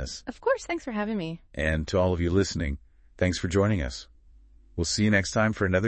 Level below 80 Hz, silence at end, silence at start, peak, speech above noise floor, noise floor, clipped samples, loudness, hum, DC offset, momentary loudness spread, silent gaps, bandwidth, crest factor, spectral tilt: -42 dBFS; 0 s; 0 s; -8 dBFS; 28 dB; -54 dBFS; under 0.1%; -27 LUFS; none; under 0.1%; 12 LU; none; 8.6 kHz; 18 dB; -5.5 dB/octave